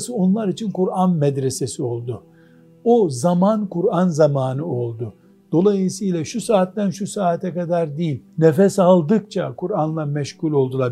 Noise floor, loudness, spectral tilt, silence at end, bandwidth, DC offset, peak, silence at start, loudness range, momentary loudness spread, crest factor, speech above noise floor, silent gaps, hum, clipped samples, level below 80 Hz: -49 dBFS; -19 LUFS; -7 dB/octave; 0 s; 12.5 kHz; under 0.1%; 0 dBFS; 0 s; 2 LU; 10 LU; 18 dB; 30 dB; none; none; under 0.1%; -64 dBFS